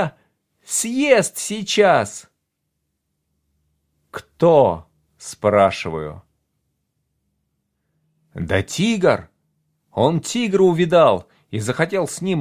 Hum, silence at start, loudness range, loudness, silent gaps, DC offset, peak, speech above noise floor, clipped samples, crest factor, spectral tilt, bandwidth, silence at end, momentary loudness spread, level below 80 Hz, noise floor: none; 0 s; 6 LU; -18 LUFS; none; under 0.1%; 0 dBFS; 57 dB; under 0.1%; 20 dB; -4.5 dB/octave; 16 kHz; 0 s; 17 LU; -48 dBFS; -75 dBFS